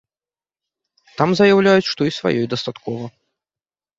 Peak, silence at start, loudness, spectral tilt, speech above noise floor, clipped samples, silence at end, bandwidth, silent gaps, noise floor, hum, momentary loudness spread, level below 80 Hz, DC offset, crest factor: -2 dBFS; 1.2 s; -17 LUFS; -6 dB/octave; over 73 dB; under 0.1%; 0.9 s; 7.8 kHz; none; under -90 dBFS; none; 16 LU; -58 dBFS; under 0.1%; 18 dB